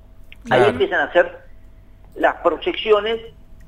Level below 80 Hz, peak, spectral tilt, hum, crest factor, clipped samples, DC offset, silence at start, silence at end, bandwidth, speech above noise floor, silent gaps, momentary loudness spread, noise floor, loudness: -44 dBFS; -2 dBFS; -5.5 dB/octave; none; 18 dB; under 0.1%; under 0.1%; 0.3 s; 0.15 s; 11.5 kHz; 25 dB; none; 7 LU; -43 dBFS; -19 LUFS